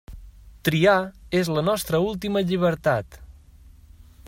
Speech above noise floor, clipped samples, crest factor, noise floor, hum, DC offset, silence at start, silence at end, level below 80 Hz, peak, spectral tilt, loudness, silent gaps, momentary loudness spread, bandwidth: 27 dB; under 0.1%; 20 dB; -49 dBFS; none; under 0.1%; 0.1 s; 0 s; -46 dBFS; -4 dBFS; -5.5 dB/octave; -23 LUFS; none; 8 LU; 16 kHz